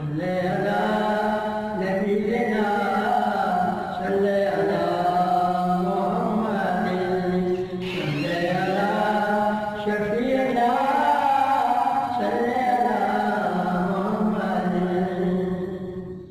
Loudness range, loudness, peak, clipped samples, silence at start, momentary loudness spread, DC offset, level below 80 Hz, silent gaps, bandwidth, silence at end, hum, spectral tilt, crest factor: 2 LU; -23 LUFS; -10 dBFS; under 0.1%; 0 s; 5 LU; under 0.1%; -54 dBFS; none; 15.5 kHz; 0 s; none; -7 dB/octave; 14 dB